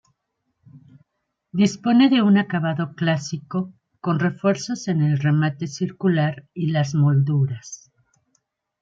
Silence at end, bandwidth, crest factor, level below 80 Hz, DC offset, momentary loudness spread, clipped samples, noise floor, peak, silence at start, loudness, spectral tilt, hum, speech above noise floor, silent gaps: 1.05 s; 7.8 kHz; 16 dB; -66 dBFS; under 0.1%; 11 LU; under 0.1%; -77 dBFS; -6 dBFS; 0.75 s; -21 LUFS; -6.5 dB/octave; none; 57 dB; none